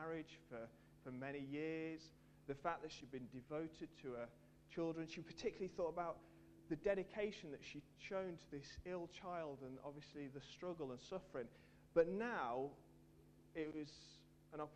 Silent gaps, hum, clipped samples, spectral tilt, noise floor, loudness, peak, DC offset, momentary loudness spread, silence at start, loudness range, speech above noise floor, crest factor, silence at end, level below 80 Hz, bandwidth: none; 50 Hz at -70 dBFS; under 0.1%; -6 dB/octave; -68 dBFS; -48 LUFS; -24 dBFS; under 0.1%; 16 LU; 0 s; 5 LU; 20 dB; 24 dB; 0 s; -72 dBFS; 13 kHz